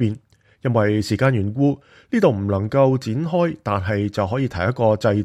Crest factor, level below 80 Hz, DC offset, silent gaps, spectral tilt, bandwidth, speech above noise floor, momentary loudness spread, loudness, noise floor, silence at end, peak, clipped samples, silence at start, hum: 16 dB; -50 dBFS; under 0.1%; none; -7.5 dB/octave; 12.5 kHz; 27 dB; 6 LU; -20 LUFS; -46 dBFS; 0 s; -4 dBFS; under 0.1%; 0 s; none